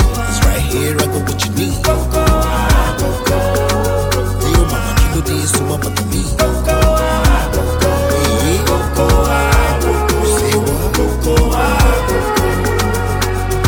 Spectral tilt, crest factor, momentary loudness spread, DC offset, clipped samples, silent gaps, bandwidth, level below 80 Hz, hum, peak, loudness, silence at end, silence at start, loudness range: -5 dB/octave; 12 dB; 4 LU; under 0.1%; under 0.1%; none; 19 kHz; -18 dBFS; none; -2 dBFS; -14 LUFS; 0 s; 0 s; 1 LU